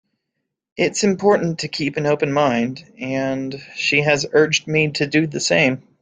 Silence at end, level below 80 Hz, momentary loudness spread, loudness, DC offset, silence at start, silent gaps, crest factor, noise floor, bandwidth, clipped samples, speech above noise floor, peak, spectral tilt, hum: 0.2 s; -58 dBFS; 9 LU; -18 LUFS; under 0.1%; 0.75 s; none; 18 dB; -78 dBFS; 9.6 kHz; under 0.1%; 59 dB; -2 dBFS; -4.5 dB/octave; none